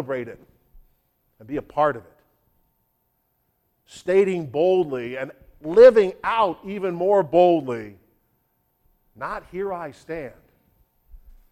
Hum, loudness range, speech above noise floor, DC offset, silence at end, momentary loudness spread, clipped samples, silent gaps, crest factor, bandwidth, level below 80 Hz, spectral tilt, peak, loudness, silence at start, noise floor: none; 15 LU; 50 dB; under 0.1%; 0.35 s; 21 LU; under 0.1%; none; 20 dB; 9.4 kHz; -56 dBFS; -7 dB/octave; -4 dBFS; -21 LUFS; 0 s; -70 dBFS